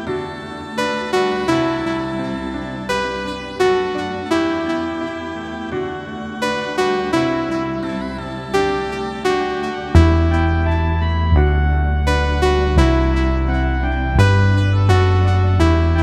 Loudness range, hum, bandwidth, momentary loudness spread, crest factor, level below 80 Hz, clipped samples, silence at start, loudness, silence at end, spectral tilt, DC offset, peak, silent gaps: 6 LU; none; 11.5 kHz; 11 LU; 16 dB; -24 dBFS; under 0.1%; 0 s; -18 LUFS; 0 s; -7 dB/octave; under 0.1%; 0 dBFS; none